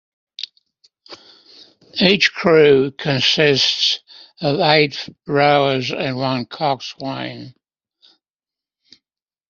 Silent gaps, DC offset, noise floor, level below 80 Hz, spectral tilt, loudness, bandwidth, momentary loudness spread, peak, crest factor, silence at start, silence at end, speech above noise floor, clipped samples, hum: none; under 0.1%; -90 dBFS; -58 dBFS; -4.5 dB/octave; -16 LUFS; 7.4 kHz; 16 LU; 0 dBFS; 18 dB; 0.4 s; 2 s; 73 dB; under 0.1%; none